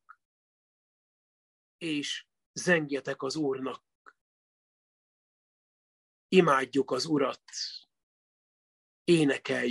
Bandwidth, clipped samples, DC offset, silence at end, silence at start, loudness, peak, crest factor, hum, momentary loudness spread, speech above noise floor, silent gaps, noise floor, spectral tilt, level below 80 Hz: 12 kHz; under 0.1%; under 0.1%; 0 s; 1.8 s; -29 LUFS; -8 dBFS; 24 dB; none; 14 LU; over 62 dB; 2.46-2.54 s, 3.95-4.05 s, 4.21-6.29 s, 8.03-9.05 s; under -90 dBFS; -4.5 dB/octave; -78 dBFS